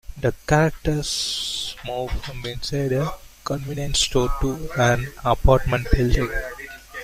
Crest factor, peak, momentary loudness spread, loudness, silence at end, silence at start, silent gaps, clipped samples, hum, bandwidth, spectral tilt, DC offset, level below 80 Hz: 20 dB; -2 dBFS; 11 LU; -23 LUFS; 0 s; 0.1 s; none; under 0.1%; none; 16 kHz; -4.5 dB/octave; under 0.1%; -28 dBFS